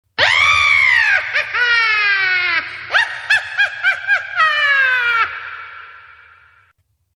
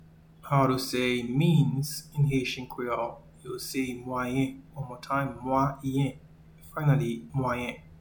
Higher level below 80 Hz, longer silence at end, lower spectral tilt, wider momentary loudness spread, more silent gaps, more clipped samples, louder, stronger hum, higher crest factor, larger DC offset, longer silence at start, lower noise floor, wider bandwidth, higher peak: about the same, -52 dBFS vs -54 dBFS; first, 1.15 s vs 0.05 s; second, 0 dB/octave vs -6.5 dB/octave; second, 8 LU vs 12 LU; neither; neither; first, -13 LUFS vs -29 LUFS; neither; about the same, 16 dB vs 18 dB; neither; first, 0.2 s vs 0 s; first, -61 dBFS vs -51 dBFS; second, 12.5 kHz vs 19 kHz; first, 0 dBFS vs -12 dBFS